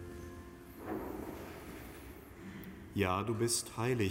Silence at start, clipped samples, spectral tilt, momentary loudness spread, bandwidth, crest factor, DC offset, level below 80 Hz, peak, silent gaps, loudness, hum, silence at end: 0 s; under 0.1%; -4.5 dB/octave; 17 LU; 16 kHz; 20 dB; under 0.1%; -58 dBFS; -18 dBFS; none; -38 LUFS; none; 0 s